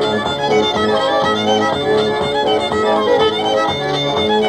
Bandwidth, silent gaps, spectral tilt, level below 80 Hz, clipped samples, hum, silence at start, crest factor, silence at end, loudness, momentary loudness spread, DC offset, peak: 10.5 kHz; none; -4.5 dB/octave; -48 dBFS; under 0.1%; none; 0 s; 12 dB; 0 s; -15 LUFS; 3 LU; 0.2%; -4 dBFS